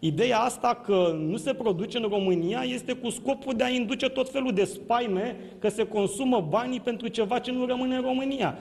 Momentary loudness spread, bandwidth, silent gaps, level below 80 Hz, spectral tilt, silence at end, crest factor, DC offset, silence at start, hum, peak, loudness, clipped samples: 6 LU; 12.5 kHz; none; -60 dBFS; -5 dB/octave; 0 s; 16 dB; under 0.1%; 0 s; none; -10 dBFS; -27 LUFS; under 0.1%